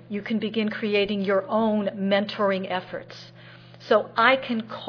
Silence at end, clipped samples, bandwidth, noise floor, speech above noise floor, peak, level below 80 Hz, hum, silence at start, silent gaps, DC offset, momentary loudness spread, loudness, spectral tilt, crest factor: 0 s; under 0.1%; 5.4 kHz; -46 dBFS; 22 dB; -2 dBFS; -64 dBFS; none; 0.1 s; none; under 0.1%; 17 LU; -24 LUFS; -7 dB/octave; 22 dB